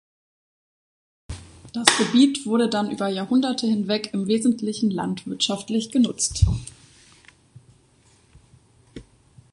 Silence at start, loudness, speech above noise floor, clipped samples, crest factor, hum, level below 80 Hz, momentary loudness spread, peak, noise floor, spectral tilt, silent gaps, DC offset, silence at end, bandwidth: 1.3 s; -22 LUFS; 36 dB; under 0.1%; 24 dB; none; -38 dBFS; 14 LU; 0 dBFS; -58 dBFS; -4 dB/octave; none; under 0.1%; 0.5 s; 11.5 kHz